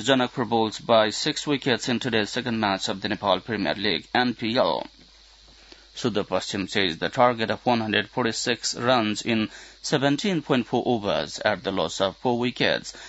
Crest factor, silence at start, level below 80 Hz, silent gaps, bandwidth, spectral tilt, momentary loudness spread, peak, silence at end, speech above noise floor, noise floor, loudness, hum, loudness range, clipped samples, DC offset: 20 dB; 0 s; -58 dBFS; none; 8 kHz; -4 dB/octave; 6 LU; -4 dBFS; 0 s; 28 dB; -52 dBFS; -24 LUFS; none; 3 LU; under 0.1%; under 0.1%